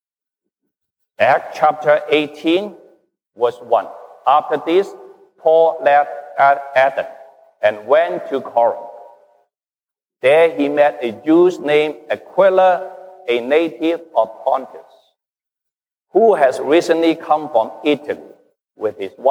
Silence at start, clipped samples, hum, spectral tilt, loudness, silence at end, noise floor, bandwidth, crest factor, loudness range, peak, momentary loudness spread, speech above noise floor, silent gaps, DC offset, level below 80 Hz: 1.2 s; under 0.1%; none; -5.5 dB/octave; -16 LUFS; 0 s; under -90 dBFS; 12.5 kHz; 16 dB; 4 LU; -2 dBFS; 11 LU; over 75 dB; none; under 0.1%; -74 dBFS